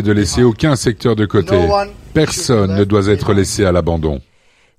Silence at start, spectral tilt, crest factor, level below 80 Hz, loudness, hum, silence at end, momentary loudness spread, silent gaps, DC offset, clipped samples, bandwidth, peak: 0 s; -5.5 dB/octave; 14 dB; -32 dBFS; -14 LUFS; none; 0.55 s; 5 LU; none; 0.1%; under 0.1%; 15 kHz; 0 dBFS